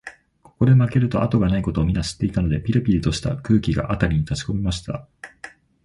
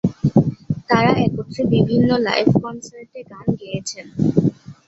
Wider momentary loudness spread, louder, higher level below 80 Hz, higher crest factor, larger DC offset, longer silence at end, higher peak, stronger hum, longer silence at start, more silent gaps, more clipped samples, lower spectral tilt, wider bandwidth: first, 20 LU vs 14 LU; about the same, -21 LUFS vs -19 LUFS; first, -34 dBFS vs -46 dBFS; about the same, 16 dB vs 16 dB; neither; first, 0.35 s vs 0.15 s; about the same, -4 dBFS vs -2 dBFS; neither; about the same, 0.05 s vs 0.05 s; neither; neither; about the same, -7 dB/octave vs -6.5 dB/octave; first, 11.5 kHz vs 8 kHz